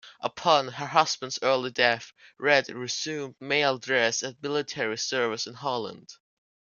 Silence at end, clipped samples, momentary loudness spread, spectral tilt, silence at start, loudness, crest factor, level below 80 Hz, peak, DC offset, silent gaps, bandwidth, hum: 0.45 s; under 0.1%; 10 LU; -2.5 dB/octave; 0.05 s; -26 LUFS; 24 dB; -74 dBFS; -4 dBFS; under 0.1%; none; 10 kHz; none